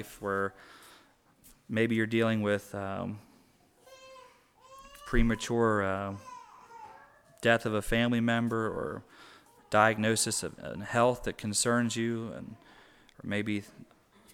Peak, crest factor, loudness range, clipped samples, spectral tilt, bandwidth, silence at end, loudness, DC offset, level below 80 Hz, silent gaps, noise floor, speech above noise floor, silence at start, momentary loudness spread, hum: -8 dBFS; 24 dB; 5 LU; under 0.1%; -4.5 dB/octave; 17 kHz; 0.5 s; -30 LUFS; under 0.1%; -44 dBFS; none; -63 dBFS; 34 dB; 0 s; 21 LU; none